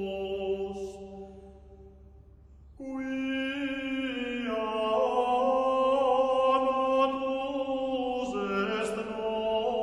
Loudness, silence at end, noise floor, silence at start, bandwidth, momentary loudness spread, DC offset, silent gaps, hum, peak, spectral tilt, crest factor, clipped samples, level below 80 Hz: -29 LUFS; 0 s; -53 dBFS; 0 s; 11.5 kHz; 12 LU; under 0.1%; none; none; -14 dBFS; -5 dB/octave; 16 dB; under 0.1%; -56 dBFS